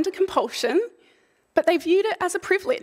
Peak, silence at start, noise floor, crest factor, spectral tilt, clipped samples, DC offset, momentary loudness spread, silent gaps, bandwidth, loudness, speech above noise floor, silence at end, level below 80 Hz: -6 dBFS; 0 s; -62 dBFS; 18 dB; -2.5 dB/octave; under 0.1%; under 0.1%; 5 LU; none; 15.5 kHz; -23 LUFS; 39 dB; 0 s; -64 dBFS